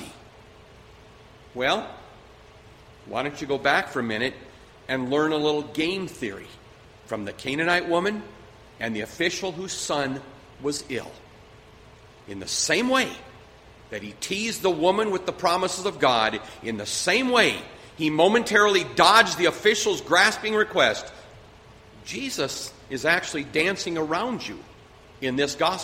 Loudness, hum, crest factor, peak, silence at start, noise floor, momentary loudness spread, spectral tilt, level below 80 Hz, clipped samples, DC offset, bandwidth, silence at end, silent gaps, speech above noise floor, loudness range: -24 LUFS; none; 24 dB; -2 dBFS; 0 s; -50 dBFS; 17 LU; -3 dB/octave; -56 dBFS; under 0.1%; under 0.1%; 16 kHz; 0 s; none; 25 dB; 10 LU